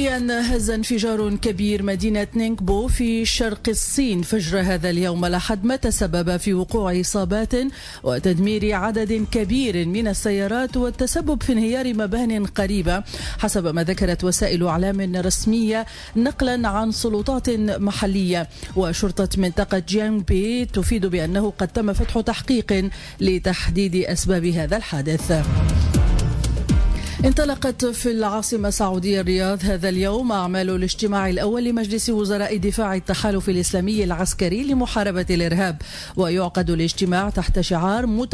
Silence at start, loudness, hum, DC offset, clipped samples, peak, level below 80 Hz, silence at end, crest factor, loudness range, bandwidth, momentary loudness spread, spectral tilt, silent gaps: 0 s; -21 LUFS; none; under 0.1%; under 0.1%; -8 dBFS; -30 dBFS; 0 s; 14 dB; 1 LU; 11 kHz; 3 LU; -5 dB/octave; none